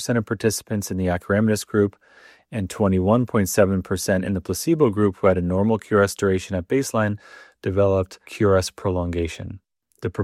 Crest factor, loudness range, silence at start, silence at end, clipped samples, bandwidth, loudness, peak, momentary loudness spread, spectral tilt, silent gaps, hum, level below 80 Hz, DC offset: 18 dB; 3 LU; 0 s; 0 s; under 0.1%; 15.5 kHz; -22 LUFS; -2 dBFS; 10 LU; -6 dB/octave; none; none; -52 dBFS; under 0.1%